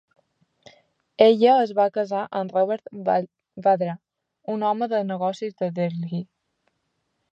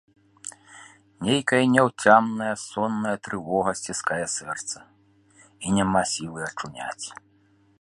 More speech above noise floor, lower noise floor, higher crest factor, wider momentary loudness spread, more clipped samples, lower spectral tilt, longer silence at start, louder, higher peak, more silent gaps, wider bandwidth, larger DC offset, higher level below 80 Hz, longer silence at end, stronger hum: first, 53 dB vs 37 dB; first, -75 dBFS vs -61 dBFS; about the same, 20 dB vs 24 dB; about the same, 15 LU vs 17 LU; neither; first, -7.5 dB/octave vs -4 dB/octave; first, 1.2 s vs 0.45 s; about the same, -23 LUFS vs -24 LUFS; about the same, -2 dBFS vs -2 dBFS; neither; second, 7.8 kHz vs 11.5 kHz; neither; second, -76 dBFS vs -58 dBFS; first, 1.1 s vs 0.65 s; neither